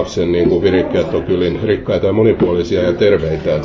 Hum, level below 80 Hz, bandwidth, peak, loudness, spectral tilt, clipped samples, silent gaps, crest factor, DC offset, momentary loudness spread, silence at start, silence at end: none; -34 dBFS; 7.6 kHz; -2 dBFS; -14 LUFS; -7.5 dB/octave; under 0.1%; none; 12 dB; under 0.1%; 4 LU; 0 s; 0 s